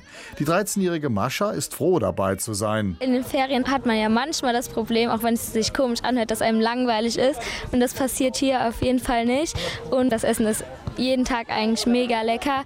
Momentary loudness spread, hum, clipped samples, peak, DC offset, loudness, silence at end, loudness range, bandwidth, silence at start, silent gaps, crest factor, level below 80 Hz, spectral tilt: 4 LU; none; under 0.1%; -8 dBFS; under 0.1%; -23 LUFS; 0 s; 1 LU; 17 kHz; 0.05 s; none; 14 dB; -46 dBFS; -4.5 dB/octave